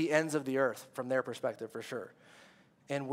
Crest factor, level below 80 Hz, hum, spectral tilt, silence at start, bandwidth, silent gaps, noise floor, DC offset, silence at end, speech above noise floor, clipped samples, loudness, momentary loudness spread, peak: 24 dB; -88 dBFS; none; -5 dB/octave; 0 s; 16 kHz; none; -61 dBFS; under 0.1%; 0 s; 27 dB; under 0.1%; -35 LUFS; 12 LU; -12 dBFS